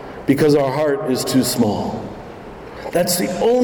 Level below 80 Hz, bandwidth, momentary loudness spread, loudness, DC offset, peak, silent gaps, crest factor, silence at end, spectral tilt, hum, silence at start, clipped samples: -46 dBFS; 19 kHz; 19 LU; -18 LUFS; under 0.1%; -4 dBFS; none; 14 dB; 0 s; -5 dB/octave; none; 0 s; under 0.1%